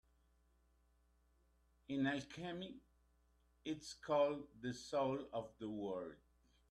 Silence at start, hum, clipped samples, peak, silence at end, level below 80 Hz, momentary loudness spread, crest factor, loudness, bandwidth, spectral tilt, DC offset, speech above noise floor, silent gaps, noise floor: 1.9 s; none; under 0.1%; -24 dBFS; 0.55 s; -74 dBFS; 13 LU; 20 dB; -43 LUFS; 12 kHz; -5.5 dB/octave; under 0.1%; 33 dB; none; -76 dBFS